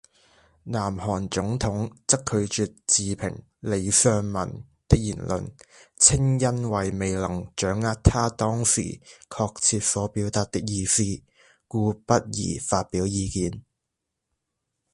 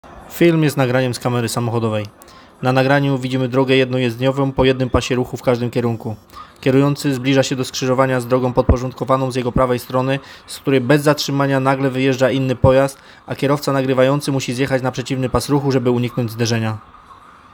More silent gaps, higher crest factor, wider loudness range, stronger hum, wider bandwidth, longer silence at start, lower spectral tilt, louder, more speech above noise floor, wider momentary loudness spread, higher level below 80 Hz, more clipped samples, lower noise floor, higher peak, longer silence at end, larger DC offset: neither; first, 26 dB vs 16 dB; about the same, 4 LU vs 2 LU; neither; second, 11.5 kHz vs 19 kHz; first, 0.65 s vs 0.05 s; second, -4 dB/octave vs -6 dB/octave; second, -24 LUFS vs -17 LUFS; first, 58 dB vs 26 dB; first, 12 LU vs 7 LU; about the same, -40 dBFS vs -36 dBFS; neither; first, -82 dBFS vs -43 dBFS; about the same, 0 dBFS vs 0 dBFS; first, 1.35 s vs 0.4 s; neither